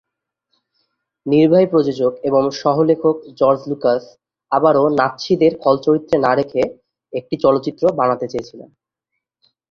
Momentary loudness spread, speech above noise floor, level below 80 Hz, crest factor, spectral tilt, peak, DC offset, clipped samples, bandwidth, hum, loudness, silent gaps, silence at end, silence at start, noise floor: 10 LU; 62 dB; -58 dBFS; 16 dB; -7 dB/octave; -2 dBFS; under 0.1%; under 0.1%; 7 kHz; none; -16 LUFS; none; 1.05 s; 1.25 s; -78 dBFS